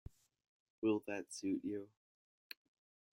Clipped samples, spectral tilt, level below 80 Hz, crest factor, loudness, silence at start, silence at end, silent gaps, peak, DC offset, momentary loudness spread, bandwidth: under 0.1%; -5 dB/octave; -72 dBFS; 20 dB; -41 LUFS; 0.8 s; 1.25 s; none; -24 dBFS; under 0.1%; 18 LU; 16 kHz